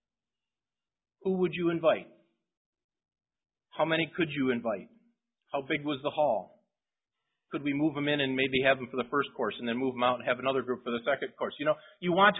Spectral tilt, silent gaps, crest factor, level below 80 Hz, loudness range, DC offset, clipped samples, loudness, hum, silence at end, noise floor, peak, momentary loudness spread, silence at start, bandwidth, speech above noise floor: -1.5 dB/octave; 2.57-2.73 s, 2.84-2.89 s; 22 dB; -70 dBFS; 5 LU; under 0.1%; under 0.1%; -30 LUFS; none; 0 s; under -90 dBFS; -10 dBFS; 8 LU; 1.25 s; 3.9 kHz; over 61 dB